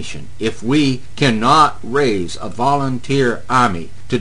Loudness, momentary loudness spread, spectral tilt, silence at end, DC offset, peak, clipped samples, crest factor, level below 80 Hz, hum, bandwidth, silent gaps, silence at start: -16 LUFS; 11 LU; -5.5 dB/octave; 0 s; 6%; 0 dBFS; under 0.1%; 18 dB; -44 dBFS; none; 10 kHz; none; 0 s